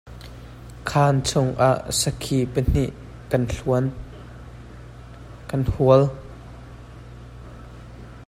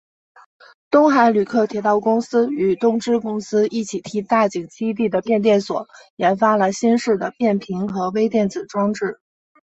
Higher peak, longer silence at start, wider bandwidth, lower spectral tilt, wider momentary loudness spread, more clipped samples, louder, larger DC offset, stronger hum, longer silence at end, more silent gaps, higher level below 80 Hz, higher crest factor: about the same, -2 dBFS vs -2 dBFS; second, 0.05 s vs 0.9 s; first, 15.5 kHz vs 8.2 kHz; about the same, -5.5 dB/octave vs -6 dB/octave; first, 23 LU vs 9 LU; neither; second, -22 LUFS vs -19 LUFS; neither; neither; second, 0.05 s vs 0.6 s; second, none vs 6.10-6.17 s; first, -38 dBFS vs -62 dBFS; about the same, 20 dB vs 18 dB